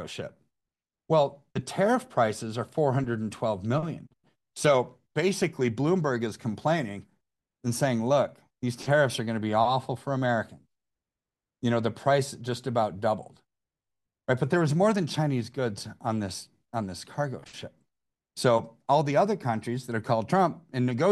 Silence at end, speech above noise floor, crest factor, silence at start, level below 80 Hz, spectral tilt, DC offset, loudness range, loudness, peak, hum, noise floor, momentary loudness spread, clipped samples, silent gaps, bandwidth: 0 s; over 63 dB; 18 dB; 0 s; -66 dBFS; -6 dB/octave; under 0.1%; 3 LU; -28 LUFS; -10 dBFS; none; under -90 dBFS; 12 LU; under 0.1%; none; 12.5 kHz